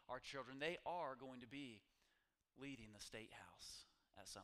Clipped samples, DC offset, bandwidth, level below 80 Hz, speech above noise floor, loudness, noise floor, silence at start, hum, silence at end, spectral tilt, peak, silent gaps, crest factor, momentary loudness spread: under 0.1%; under 0.1%; 15 kHz; -78 dBFS; 32 dB; -53 LUFS; -86 dBFS; 0 s; none; 0 s; -3.5 dB/octave; -32 dBFS; none; 24 dB; 13 LU